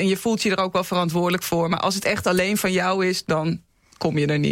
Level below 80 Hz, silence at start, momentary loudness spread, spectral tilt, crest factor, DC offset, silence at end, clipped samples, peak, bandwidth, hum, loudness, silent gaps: -54 dBFS; 0 s; 3 LU; -5 dB/octave; 12 dB; under 0.1%; 0 s; under 0.1%; -10 dBFS; 16.5 kHz; none; -22 LUFS; none